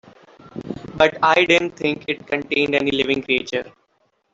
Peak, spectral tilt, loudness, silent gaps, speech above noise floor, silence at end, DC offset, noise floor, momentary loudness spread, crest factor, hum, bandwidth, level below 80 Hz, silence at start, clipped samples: -2 dBFS; -4.5 dB/octave; -19 LUFS; none; 46 dB; 0.65 s; under 0.1%; -66 dBFS; 18 LU; 18 dB; none; 7.8 kHz; -54 dBFS; 0.55 s; under 0.1%